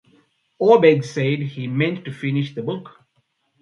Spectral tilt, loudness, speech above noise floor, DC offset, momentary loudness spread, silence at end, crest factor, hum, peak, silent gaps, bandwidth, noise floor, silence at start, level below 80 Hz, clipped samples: -7 dB/octave; -19 LUFS; 49 dB; under 0.1%; 14 LU; 0.75 s; 20 dB; none; 0 dBFS; none; 7.4 kHz; -68 dBFS; 0.6 s; -66 dBFS; under 0.1%